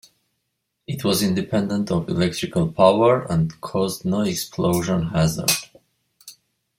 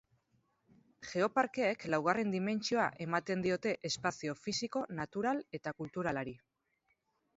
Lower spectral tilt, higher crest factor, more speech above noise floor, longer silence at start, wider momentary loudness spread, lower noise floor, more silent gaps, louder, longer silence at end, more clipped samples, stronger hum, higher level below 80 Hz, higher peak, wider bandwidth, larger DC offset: about the same, -5 dB/octave vs -4 dB/octave; about the same, 20 dB vs 22 dB; first, 56 dB vs 44 dB; about the same, 0.9 s vs 1 s; about the same, 7 LU vs 9 LU; second, -76 dBFS vs -80 dBFS; neither; first, -21 LUFS vs -36 LUFS; second, 0.45 s vs 1 s; neither; neither; first, -50 dBFS vs -72 dBFS; first, -2 dBFS vs -14 dBFS; first, 16.5 kHz vs 7.6 kHz; neither